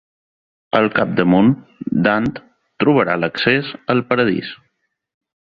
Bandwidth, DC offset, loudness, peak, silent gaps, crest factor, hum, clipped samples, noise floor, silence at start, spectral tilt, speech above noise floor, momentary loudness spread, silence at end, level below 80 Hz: 6.2 kHz; under 0.1%; -17 LUFS; -2 dBFS; none; 16 dB; none; under 0.1%; -69 dBFS; 0.75 s; -8.5 dB/octave; 53 dB; 10 LU; 0.9 s; -52 dBFS